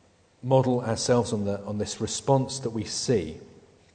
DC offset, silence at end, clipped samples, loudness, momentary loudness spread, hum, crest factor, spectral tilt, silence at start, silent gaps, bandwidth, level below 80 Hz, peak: under 0.1%; 0.35 s; under 0.1%; -26 LUFS; 8 LU; none; 20 dB; -5.5 dB/octave; 0.45 s; none; 9.4 kHz; -56 dBFS; -8 dBFS